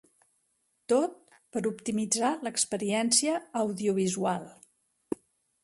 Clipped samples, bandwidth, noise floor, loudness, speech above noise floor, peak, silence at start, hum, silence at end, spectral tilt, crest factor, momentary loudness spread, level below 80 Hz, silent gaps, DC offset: under 0.1%; 12 kHz; -75 dBFS; -29 LUFS; 46 dB; -10 dBFS; 0.9 s; none; 1.1 s; -3.5 dB/octave; 22 dB; 15 LU; -72 dBFS; none; under 0.1%